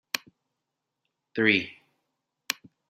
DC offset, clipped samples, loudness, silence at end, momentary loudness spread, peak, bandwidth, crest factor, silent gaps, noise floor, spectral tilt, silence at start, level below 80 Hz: under 0.1%; under 0.1%; -27 LUFS; 0.4 s; 15 LU; -4 dBFS; 16 kHz; 28 dB; none; -84 dBFS; -3 dB/octave; 0.15 s; -76 dBFS